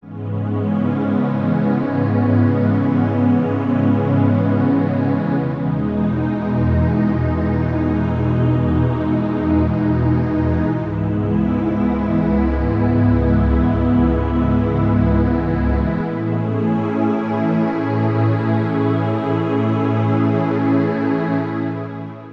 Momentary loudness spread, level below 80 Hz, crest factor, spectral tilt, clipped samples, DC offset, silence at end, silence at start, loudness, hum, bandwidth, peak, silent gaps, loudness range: 4 LU; -30 dBFS; 14 dB; -10.5 dB/octave; under 0.1%; under 0.1%; 0 s; 0.05 s; -18 LUFS; none; 5.4 kHz; -4 dBFS; none; 2 LU